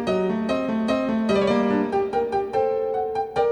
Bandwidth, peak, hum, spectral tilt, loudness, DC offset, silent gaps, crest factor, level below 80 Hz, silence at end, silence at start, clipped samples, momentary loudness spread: 10.5 kHz; -8 dBFS; none; -6.5 dB/octave; -23 LUFS; under 0.1%; none; 14 dB; -52 dBFS; 0 s; 0 s; under 0.1%; 4 LU